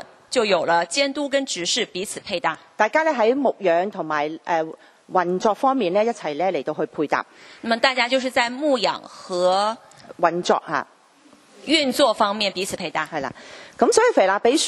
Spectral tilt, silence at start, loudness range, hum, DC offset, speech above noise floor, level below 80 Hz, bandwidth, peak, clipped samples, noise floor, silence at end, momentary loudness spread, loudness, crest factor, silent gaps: -3 dB/octave; 0 s; 2 LU; none; under 0.1%; 32 dB; -66 dBFS; 12.5 kHz; -2 dBFS; under 0.1%; -53 dBFS; 0 s; 10 LU; -21 LUFS; 20 dB; none